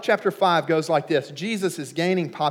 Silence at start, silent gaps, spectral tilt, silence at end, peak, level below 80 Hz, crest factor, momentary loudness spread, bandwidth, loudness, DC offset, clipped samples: 0 s; none; -5 dB/octave; 0 s; -6 dBFS; -84 dBFS; 16 dB; 6 LU; 17 kHz; -23 LUFS; under 0.1%; under 0.1%